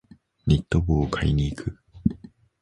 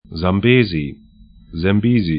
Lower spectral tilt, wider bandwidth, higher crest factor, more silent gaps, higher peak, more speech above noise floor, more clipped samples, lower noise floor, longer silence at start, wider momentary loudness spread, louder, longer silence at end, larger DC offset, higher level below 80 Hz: second, -7.5 dB/octave vs -12.5 dB/octave; first, 10.5 kHz vs 5.2 kHz; about the same, 20 dB vs 16 dB; neither; second, -6 dBFS vs 0 dBFS; second, 23 dB vs 29 dB; neither; about the same, -45 dBFS vs -44 dBFS; first, 0.45 s vs 0.1 s; about the same, 12 LU vs 14 LU; second, -25 LUFS vs -16 LUFS; first, 0.45 s vs 0 s; neither; first, -34 dBFS vs -40 dBFS